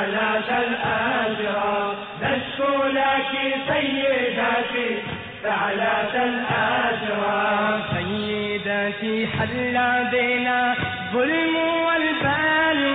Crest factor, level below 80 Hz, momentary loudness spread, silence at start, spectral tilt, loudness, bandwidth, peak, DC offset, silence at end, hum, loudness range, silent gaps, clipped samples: 12 dB; -54 dBFS; 5 LU; 0 s; -8.5 dB/octave; -22 LUFS; 4.5 kHz; -10 dBFS; under 0.1%; 0 s; none; 2 LU; none; under 0.1%